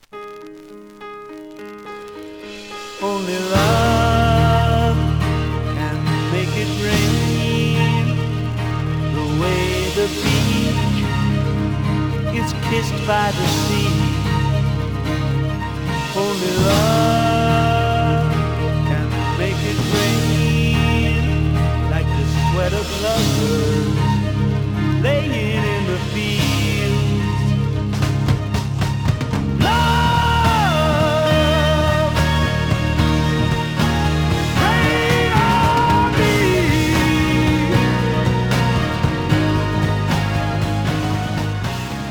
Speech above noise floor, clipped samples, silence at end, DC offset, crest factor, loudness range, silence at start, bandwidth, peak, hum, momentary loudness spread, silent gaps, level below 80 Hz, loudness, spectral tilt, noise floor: 22 dB; under 0.1%; 0 s; under 0.1%; 16 dB; 3 LU; 0.15 s; over 20 kHz; -2 dBFS; none; 7 LU; none; -30 dBFS; -18 LUFS; -6 dB/octave; -38 dBFS